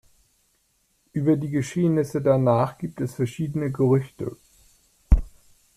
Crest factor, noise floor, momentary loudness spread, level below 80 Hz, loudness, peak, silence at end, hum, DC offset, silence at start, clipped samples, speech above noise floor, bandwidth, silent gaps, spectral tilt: 22 dB; -68 dBFS; 11 LU; -32 dBFS; -24 LUFS; -4 dBFS; 0.5 s; none; under 0.1%; 1.15 s; under 0.1%; 45 dB; 14 kHz; none; -8.5 dB/octave